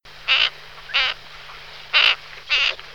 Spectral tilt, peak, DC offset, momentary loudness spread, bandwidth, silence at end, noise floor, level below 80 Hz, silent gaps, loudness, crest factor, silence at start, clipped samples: 0.5 dB/octave; 0 dBFS; 0.5%; 22 LU; 18.5 kHz; 0 s; -40 dBFS; -52 dBFS; none; -18 LUFS; 22 dB; 0.05 s; under 0.1%